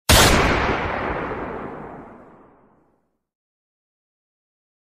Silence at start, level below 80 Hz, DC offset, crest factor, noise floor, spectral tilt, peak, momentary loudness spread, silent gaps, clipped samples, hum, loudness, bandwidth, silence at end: 0.1 s; -32 dBFS; under 0.1%; 22 dB; -67 dBFS; -3.5 dB/octave; -2 dBFS; 24 LU; none; under 0.1%; none; -19 LUFS; 15 kHz; 2.7 s